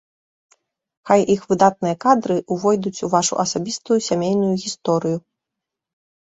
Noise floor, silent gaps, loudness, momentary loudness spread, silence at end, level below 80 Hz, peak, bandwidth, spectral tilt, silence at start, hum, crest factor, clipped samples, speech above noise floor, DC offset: -84 dBFS; none; -19 LUFS; 6 LU; 1.2 s; -60 dBFS; 0 dBFS; 8.2 kHz; -5 dB/octave; 1.05 s; none; 20 dB; under 0.1%; 65 dB; under 0.1%